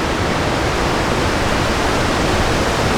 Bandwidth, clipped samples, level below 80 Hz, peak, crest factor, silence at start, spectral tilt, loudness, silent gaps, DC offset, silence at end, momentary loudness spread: over 20 kHz; under 0.1%; -26 dBFS; -4 dBFS; 14 dB; 0 s; -4.5 dB/octave; -17 LUFS; none; under 0.1%; 0 s; 1 LU